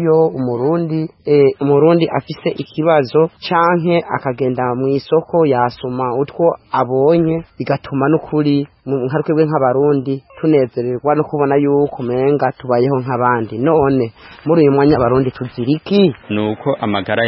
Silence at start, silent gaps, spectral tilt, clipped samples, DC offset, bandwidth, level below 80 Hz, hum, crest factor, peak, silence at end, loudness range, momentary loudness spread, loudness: 0 s; none; -12 dB/octave; under 0.1%; under 0.1%; 5.8 kHz; -48 dBFS; none; 14 dB; 0 dBFS; 0 s; 2 LU; 8 LU; -15 LUFS